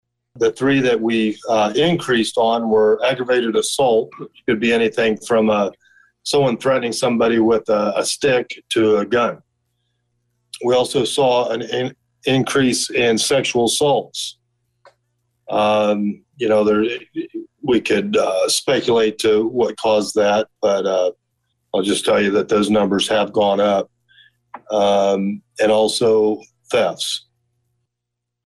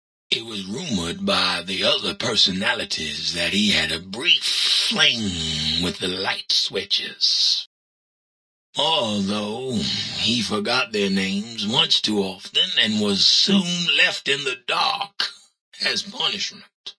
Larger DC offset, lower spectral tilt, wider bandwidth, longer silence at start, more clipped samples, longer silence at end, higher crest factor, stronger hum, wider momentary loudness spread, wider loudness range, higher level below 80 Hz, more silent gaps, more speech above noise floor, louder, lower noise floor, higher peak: neither; first, -4 dB/octave vs -2.5 dB/octave; first, 12.5 kHz vs 11 kHz; about the same, 0.35 s vs 0.3 s; neither; first, 1.25 s vs 0.05 s; second, 10 dB vs 20 dB; neither; about the same, 8 LU vs 9 LU; about the same, 3 LU vs 4 LU; about the same, -56 dBFS vs -54 dBFS; second, none vs 7.66-8.73 s, 15.61-15.72 s, 16.74-16.84 s; second, 63 dB vs over 68 dB; about the same, -18 LUFS vs -20 LUFS; second, -80 dBFS vs under -90 dBFS; second, -8 dBFS vs -2 dBFS